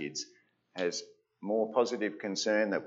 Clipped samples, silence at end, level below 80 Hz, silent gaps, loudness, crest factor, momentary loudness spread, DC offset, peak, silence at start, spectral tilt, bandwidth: under 0.1%; 0 s; -88 dBFS; none; -33 LUFS; 20 dB; 15 LU; under 0.1%; -14 dBFS; 0 s; -3.5 dB/octave; 8 kHz